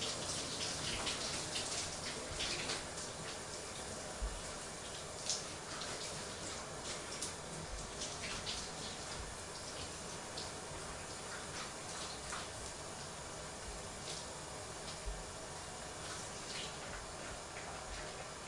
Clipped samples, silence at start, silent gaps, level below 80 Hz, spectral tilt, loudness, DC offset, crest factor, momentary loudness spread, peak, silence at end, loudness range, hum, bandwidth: under 0.1%; 0 s; none; -56 dBFS; -2 dB/octave; -43 LUFS; under 0.1%; 24 dB; 7 LU; -20 dBFS; 0 s; 5 LU; none; 11.5 kHz